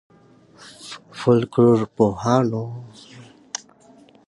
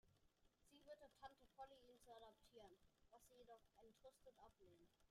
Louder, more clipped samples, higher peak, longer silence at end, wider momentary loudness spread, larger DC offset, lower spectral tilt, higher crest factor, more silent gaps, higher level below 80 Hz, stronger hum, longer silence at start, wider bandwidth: first, -19 LUFS vs -67 LUFS; neither; first, -4 dBFS vs -46 dBFS; first, 0.7 s vs 0 s; first, 21 LU vs 5 LU; neither; first, -7 dB/octave vs -3.5 dB/octave; about the same, 18 dB vs 22 dB; neither; first, -56 dBFS vs -84 dBFS; neither; first, 0.65 s vs 0.05 s; second, 11.5 kHz vs 14 kHz